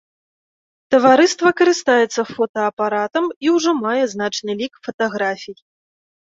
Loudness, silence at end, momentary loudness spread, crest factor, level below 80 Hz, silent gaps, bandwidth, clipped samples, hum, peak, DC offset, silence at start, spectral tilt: -17 LUFS; 0.75 s; 11 LU; 16 dB; -66 dBFS; 2.49-2.54 s, 2.73-2.77 s, 3.36-3.41 s, 4.94-4.99 s; 7.8 kHz; under 0.1%; none; -2 dBFS; under 0.1%; 0.9 s; -3.5 dB/octave